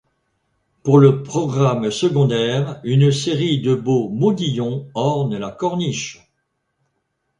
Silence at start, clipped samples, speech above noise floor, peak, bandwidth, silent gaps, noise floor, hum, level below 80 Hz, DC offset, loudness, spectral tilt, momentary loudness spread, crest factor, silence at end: 0.85 s; under 0.1%; 55 dB; 0 dBFS; 10 kHz; none; -72 dBFS; none; -56 dBFS; under 0.1%; -18 LUFS; -6.5 dB/octave; 9 LU; 18 dB; 1.25 s